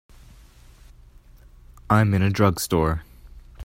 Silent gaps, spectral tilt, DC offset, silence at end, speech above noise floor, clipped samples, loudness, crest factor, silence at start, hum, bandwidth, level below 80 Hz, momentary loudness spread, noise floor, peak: none; -6 dB/octave; under 0.1%; 0 s; 29 dB; under 0.1%; -21 LUFS; 22 dB; 1.9 s; none; 16 kHz; -42 dBFS; 6 LU; -49 dBFS; -2 dBFS